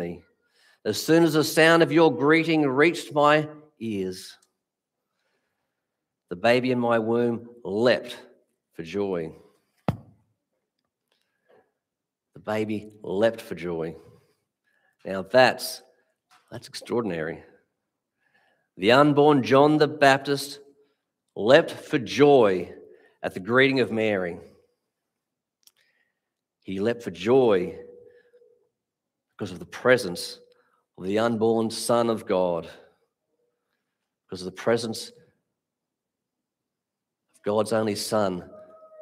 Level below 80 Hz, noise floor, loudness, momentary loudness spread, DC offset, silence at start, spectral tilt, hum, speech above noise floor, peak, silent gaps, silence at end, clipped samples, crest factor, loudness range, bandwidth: -68 dBFS; -86 dBFS; -23 LUFS; 20 LU; under 0.1%; 0 s; -5 dB/octave; none; 63 dB; 0 dBFS; none; 0.35 s; under 0.1%; 24 dB; 13 LU; 16 kHz